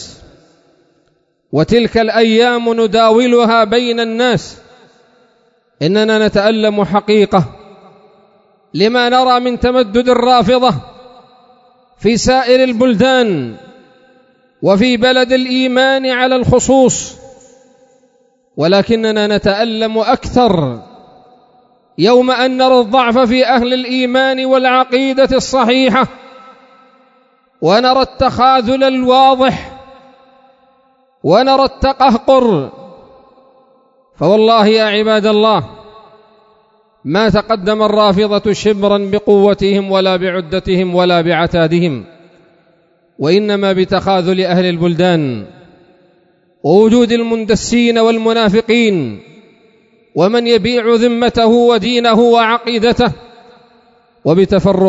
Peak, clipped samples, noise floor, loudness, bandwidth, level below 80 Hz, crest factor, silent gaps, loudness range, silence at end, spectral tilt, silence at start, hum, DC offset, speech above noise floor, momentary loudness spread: 0 dBFS; under 0.1%; -59 dBFS; -11 LUFS; 8 kHz; -40 dBFS; 12 dB; none; 3 LU; 0 s; -5 dB/octave; 0 s; none; under 0.1%; 48 dB; 8 LU